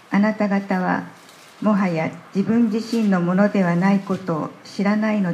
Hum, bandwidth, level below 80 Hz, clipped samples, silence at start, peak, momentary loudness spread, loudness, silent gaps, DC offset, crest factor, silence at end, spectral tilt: none; 9.8 kHz; -70 dBFS; under 0.1%; 0.1 s; -4 dBFS; 8 LU; -21 LUFS; none; under 0.1%; 16 dB; 0 s; -7.5 dB/octave